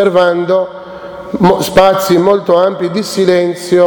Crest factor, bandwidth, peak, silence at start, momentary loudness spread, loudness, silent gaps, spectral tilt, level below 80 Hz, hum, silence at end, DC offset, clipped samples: 10 dB; over 20 kHz; 0 dBFS; 0 s; 14 LU; -11 LUFS; none; -5.5 dB/octave; -42 dBFS; none; 0 s; under 0.1%; 0.4%